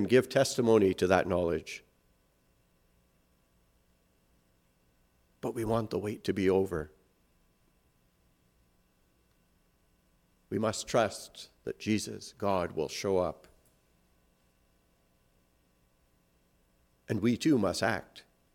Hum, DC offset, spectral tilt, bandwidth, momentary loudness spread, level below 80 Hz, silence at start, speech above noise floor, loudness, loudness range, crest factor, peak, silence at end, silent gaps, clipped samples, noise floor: none; under 0.1%; -5.5 dB/octave; 16.5 kHz; 15 LU; -64 dBFS; 0 s; 40 dB; -30 LUFS; 10 LU; 24 dB; -10 dBFS; 0.35 s; none; under 0.1%; -70 dBFS